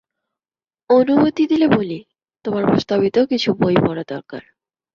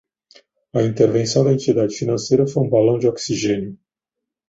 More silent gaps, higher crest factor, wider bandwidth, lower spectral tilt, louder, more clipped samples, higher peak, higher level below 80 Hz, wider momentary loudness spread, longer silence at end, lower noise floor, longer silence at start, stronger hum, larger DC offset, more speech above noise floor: neither; about the same, 16 dB vs 16 dB; second, 7.2 kHz vs 8.2 kHz; first, -7.5 dB/octave vs -6 dB/octave; about the same, -17 LUFS vs -18 LUFS; neither; about the same, -2 dBFS vs -2 dBFS; about the same, -54 dBFS vs -54 dBFS; first, 15 LU vs 6 LU; second, 0.55 s vs 0.75 s; first, under -90 dBFS vs -83 dBFS; first, 0.9 s vs 0.75 s; neither; neither; first, over 74 dB vs 66 dB